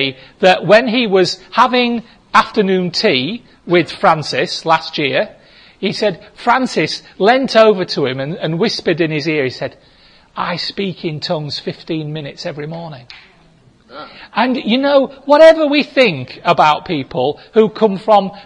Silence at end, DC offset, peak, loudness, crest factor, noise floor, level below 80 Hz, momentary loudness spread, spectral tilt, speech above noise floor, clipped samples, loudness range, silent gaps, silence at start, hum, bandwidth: 0.05 s; under 0.1%; 0 dBFS; -14 LUFS; 14 dB; -49 dBFS; -54 dBFS; 14 LU; -5.5 dB/octave; 34 dB; under 0.1%; 10 LU; none; 0 s; none; 10.5 kHz